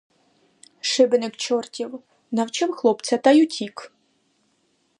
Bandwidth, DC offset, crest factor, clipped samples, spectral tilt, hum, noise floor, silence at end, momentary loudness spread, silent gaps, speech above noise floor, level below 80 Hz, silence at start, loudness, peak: 11 kHz; under 0.1%; 20 dB; under 0.1%; -3.5 dB/octave; none; -67 dBFS; 1.1 s; 16 LU; none; 46 dB; -78 dBFS; 0.85 s; -21 LUFS; -4 dBFS